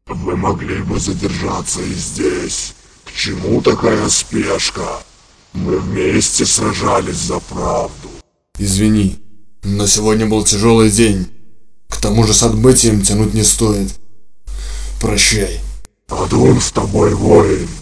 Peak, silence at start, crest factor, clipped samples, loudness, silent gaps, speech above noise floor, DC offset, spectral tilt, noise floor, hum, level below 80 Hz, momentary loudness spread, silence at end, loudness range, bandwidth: 0 dBFS; 0.05 s; 14 dB; 0.1%; -14 LUFS; none; 28 dB; under 0.1%; -4 dB/octave; -41 dBFS; none; -28 dBFS; 16 LU; 0 s; 5 LU; 11 kHz